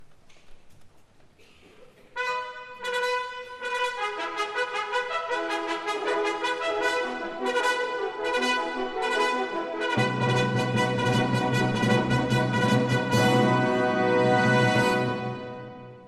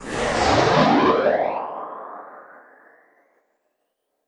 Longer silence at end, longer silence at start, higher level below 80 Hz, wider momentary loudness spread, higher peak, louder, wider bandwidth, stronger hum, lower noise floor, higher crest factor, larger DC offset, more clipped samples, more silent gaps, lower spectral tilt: second, 0 s vs 1.85 s; about the same, 0 s vs 0 s; second, -58 dBFS vs -46 dBFS; second, 10 LU vs 21 LU; second, -10 dBFS vs -4 dBFS; second, -25 LUFS vs -19 LUFS; first, 13.5 kHz vs 11 kHz; neither; second, -54 dBFS vs -75 dBFS; about the same, 16 dB vs 20 dB; neither; neither; neither; about the same, -5.5 dB/octave vs -5 dB/octave